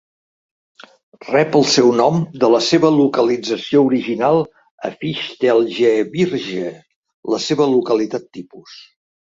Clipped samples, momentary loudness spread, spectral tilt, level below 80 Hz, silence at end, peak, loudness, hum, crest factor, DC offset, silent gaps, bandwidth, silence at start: under 0.1%; 15 LU; -5 dB/octave; -60 dBFS; 0.45 s; -2 dBFS; -16 LUFS; none; 16 dB; under 0.1%; 4.71-4.78 s, 6.96-7.03 s, 7.14-7.23 s; 7.8 kHz; 1.25 s